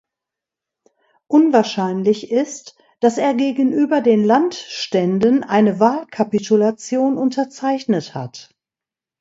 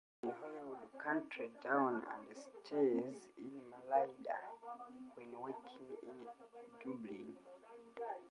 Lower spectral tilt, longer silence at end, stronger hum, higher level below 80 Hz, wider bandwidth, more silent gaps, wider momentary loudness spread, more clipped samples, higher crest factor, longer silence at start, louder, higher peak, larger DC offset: about the same, -6 dB/octave vs -6 dB/octave; first, 0.8 s vs 0 s; neither; first, -66 dBFS vs -88 dBFS; second, 8 kHz vs 11 kHz; neither; second, 8 LU vs 18 LU; neither; about the same, 18 dB vs 22 dB; first, 1.3 s vs 0.25 s; first, -17 LUFS vs -43 LUFS; first, 0 dBFS vs -22 dBFS; neither